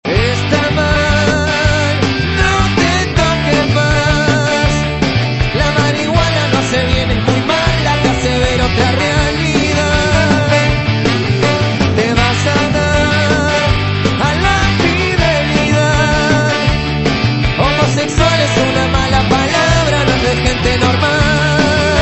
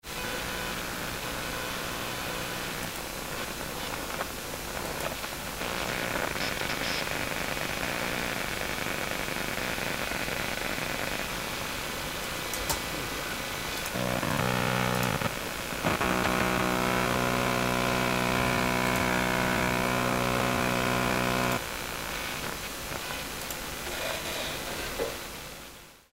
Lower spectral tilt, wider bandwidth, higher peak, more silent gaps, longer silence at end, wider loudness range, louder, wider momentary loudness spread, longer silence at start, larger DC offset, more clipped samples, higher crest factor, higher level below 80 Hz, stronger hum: first, -5 dB/octave vs -3.5 dB/octave; second, 8.4 kHz vs 16 kHz; first, 0 dBFS vs -12 dBFS; neither; about the same, 0 s vs 0.1 s; second, 1 LU vs 7 LU; first, -12 LUFS vs -30 LUFS; second, 2 LU vs 8 LU; about the same, 0.05 s vs 0.05 s; second, under 0.1% vs 0.1%; neither; second, 12 dB vs 20 dB; first, -24 dBFS vs -46 dBFS; neither